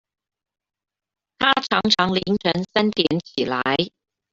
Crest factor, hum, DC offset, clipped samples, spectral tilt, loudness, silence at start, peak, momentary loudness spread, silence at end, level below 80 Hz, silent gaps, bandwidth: 20 dB; none; under 0.1%; under 0.1%; -5 dB/octave; -20 LUFS; 1.4 s; -2 dBFS; 6 LU; 0.45 s; -56 dBFS; none; 7.8 kHz